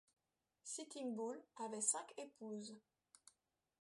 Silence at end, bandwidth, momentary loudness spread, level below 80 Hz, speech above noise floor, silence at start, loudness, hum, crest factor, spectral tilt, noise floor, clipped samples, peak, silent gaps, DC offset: 1 s; 11.5 kHz; 16 LU; under -90 dBFS; 38 dB; 0.65 s; -46 LUFS; none; 26 dB; -2.5 dB/octave; -85 dBFS; under 0.1%; -24 dBFS; none; under 0.1%